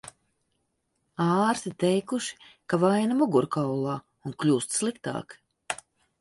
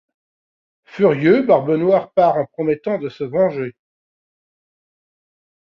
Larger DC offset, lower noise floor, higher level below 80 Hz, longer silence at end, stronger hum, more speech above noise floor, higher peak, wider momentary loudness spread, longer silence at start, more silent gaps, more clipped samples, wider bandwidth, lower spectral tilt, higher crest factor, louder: neither; second, -76 dBFS vs under -90 dBFS; second, -68 dBFS vs -62 dBFS; second, 0.45 s vs 2.1 s; neither; second, 50 dB vs over 74 dB; second, -10 dBFS vs -2 dBFS; first, 13 LU vs 10 LU; second, 0.05 s vs 0.95 s; neither; neither; first, 11.5 kHz vs 6.4 kHz; second, -5.5 dB/octave vs -9 dB/octave; about the same, 18 dB vs 18 dB; second, -27 LUFS vs -17 LUFS